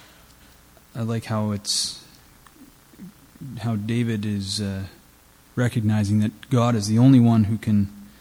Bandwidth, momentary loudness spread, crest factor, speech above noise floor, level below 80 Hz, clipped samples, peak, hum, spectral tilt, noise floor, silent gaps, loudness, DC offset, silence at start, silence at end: 16 kHz; 18 LU; 18 dB; 32 dB; -56 dBFS; under 0.1%; -4 dBFS; none; -6 dB/octave; -53 dBFS; none; -22 LUFS; under 0.1%; 0.95 s; 0.15 s